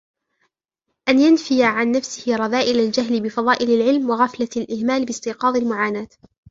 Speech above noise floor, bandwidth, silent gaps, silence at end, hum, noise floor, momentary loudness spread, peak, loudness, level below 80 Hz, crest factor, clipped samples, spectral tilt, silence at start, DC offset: 59 dB; 7.8 kHz; none; 0.45 s; none; -78 dBFS; 8 LU; -2 dBFS; -19 LUFS; -62 dBFS; 18 dB; under 0.1%; -4 dB/octave; 1.05 s; under 0.1%